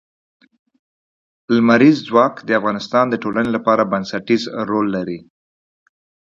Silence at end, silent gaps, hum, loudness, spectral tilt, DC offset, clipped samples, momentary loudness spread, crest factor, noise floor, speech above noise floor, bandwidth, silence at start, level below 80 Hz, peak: 1.2 s; none; none; -17 LUFS; -6.5 dB/octave; under 0.1%; under 0.1%; 9 LU; 18 dB; under -90 dBFS; over 74 dB; 7.4 kHz; 1.5 s; -58 dBFS; 0 dBFS